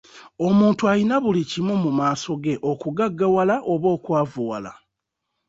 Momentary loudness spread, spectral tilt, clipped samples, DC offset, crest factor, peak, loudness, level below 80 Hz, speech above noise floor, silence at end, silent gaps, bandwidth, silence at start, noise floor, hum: 8 LU; -7 dB/octave; under 0.1%; under 0.1%; 16 dB; -6 dBFS; -21 LUFS; -60 dBFS; 59 dB; 0.75 s; none; 7.8 kHz; 0.15 s; -80 dBFS; none